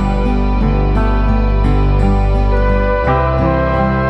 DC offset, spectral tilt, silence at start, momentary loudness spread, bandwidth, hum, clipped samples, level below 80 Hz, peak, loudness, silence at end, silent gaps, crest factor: under 0.1%; -9 dB/octave; 0 s; 1 LU; 5.8 kHz; none; under 0.1%; -14 dBFS; -2 dBFS; -15 LUFS; 0 s; none; 10 dB